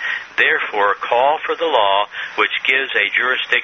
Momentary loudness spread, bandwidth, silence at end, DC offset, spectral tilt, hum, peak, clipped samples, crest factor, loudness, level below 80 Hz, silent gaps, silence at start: 4 LU; 7.4 kHz; 0 s; under 0.1%; 2.5 dB/octave; none; 0 dBFS; under 0.1%; 16 dB; -16 LUFS; -66 dBFS; none; 0 s